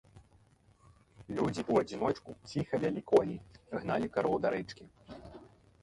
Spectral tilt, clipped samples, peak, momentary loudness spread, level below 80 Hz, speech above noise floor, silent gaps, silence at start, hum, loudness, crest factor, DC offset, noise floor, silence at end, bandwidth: -7 dB/octave; under 0.1%; -12 dBFS; 21 LU; -62 dBFS; 32 dB; none; 0.15 s; none; -33 LUFS; 22 dB; under 0.1%; -65 dBFS; 0.4 s; 11.5 kHz